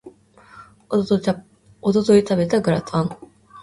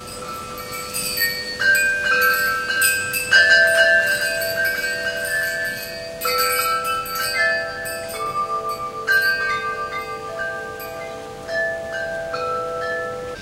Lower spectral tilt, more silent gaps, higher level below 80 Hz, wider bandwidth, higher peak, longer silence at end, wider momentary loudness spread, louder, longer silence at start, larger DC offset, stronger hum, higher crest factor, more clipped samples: first, -7 dB/octave vs -1 dB/octave; neither; about the same, -52 dBFS vs -52 dBFS; second, 11.5 kHz vs 17 kHz; about the same, -4 dBFS vs -2 dBFS; about the same, 0 s vs 0 s; second, 11 LU vs 15 LU; about the same, -20 LUFS vs -19 LUFS; about the same, 0.05 s vs 0 s; neither; neither; about the same, 18 dB vs 20 dB; neither